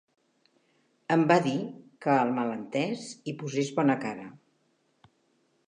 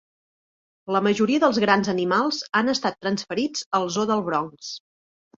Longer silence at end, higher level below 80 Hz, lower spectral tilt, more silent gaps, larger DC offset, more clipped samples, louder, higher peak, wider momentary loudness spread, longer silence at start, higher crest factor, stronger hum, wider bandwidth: first, 1.3 s vs 0.6 s; second, -80 dBFS vs -66 dBFS; first, -6 dB/octave vs -4.5 dB/octave; second, none vs 3.66-3.71 s; neither; neither; second, -28 LUFS vs -23 LUFS; second, -8 dBFS vs -2 dBFS; first, 16 LU vs 12 LU; first, 1.1 s vs 0.85 s; about the same, 22 dB vs 20 dB; neither; first, 10 kHz vs 7.8 kHz